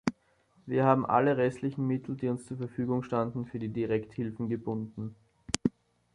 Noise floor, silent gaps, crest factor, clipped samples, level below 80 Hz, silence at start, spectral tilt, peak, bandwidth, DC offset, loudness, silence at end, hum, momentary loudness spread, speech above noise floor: -67 dBFS; none; 26 dB; under 0.1%; -62 dBFS; 0.05 s; -6.5 dB/octave; -4 dBFS; 11.5 kHz; under 0.1%; -31 LUFS; 0.45 s; none; 11 LU; 37 dB